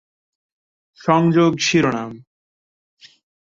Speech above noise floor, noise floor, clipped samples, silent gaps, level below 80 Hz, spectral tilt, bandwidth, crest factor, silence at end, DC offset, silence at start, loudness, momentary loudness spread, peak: over 73 dB; under -90 dBFS; under 0.1%; none; -58 dBFS; -5.5 dB/octave; 7.6 kHz; 20 dB; 1.4 s; under 0.1%; 1.05 s; -17 LUFS; 12 LU; -2 dBFS